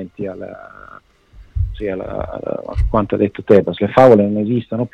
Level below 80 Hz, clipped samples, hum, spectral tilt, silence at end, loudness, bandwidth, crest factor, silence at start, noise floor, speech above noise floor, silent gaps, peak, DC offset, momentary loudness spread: -30 dBFS; under 0.1%; none; -9 dB/octave; 0.05 s; -16 LUFS; 8.4 kHz; 16 dB; 0 s; -44 dBFS; 28 dB; none; 0 dBFS; under 0.1%; 18 LU